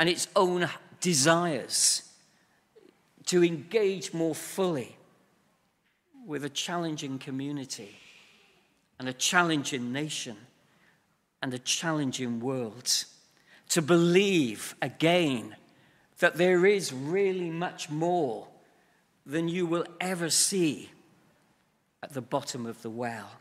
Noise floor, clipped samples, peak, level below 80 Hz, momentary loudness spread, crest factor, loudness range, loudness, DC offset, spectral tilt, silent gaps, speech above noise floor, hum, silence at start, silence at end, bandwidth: -72 dBFS; under 0.1%; -6 dBFS; -78 dBFS; 14 LU; 24 dB; 7 LU; -28 LUFS; under 0.1%; -3.5 dB/octave; none; 44 dB; none; 0 s; 0.05 s; 16 kHz